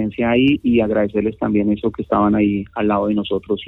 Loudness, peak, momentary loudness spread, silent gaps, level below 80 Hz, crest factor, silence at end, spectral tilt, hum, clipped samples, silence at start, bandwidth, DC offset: -18 LUFS; -4 dBFS; 6 LU; none; -42 dBFS; 12 dB; 0 s; -9.5 dB/octave; none; under 0.1%; 0 s; 4.1 kHz; under 0.1%